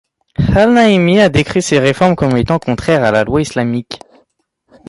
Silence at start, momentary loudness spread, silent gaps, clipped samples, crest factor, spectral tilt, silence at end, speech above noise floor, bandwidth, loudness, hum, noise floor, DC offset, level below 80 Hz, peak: 0.4 s; 10 LU; none; under 0.1%; 12 dB; -6 dB/octave; 0.95 s; 50 dB; 11.5 kHz; -12 LUFS; none; -62 dBFS; under 0.1%; -32 dBFS; 0 dBFS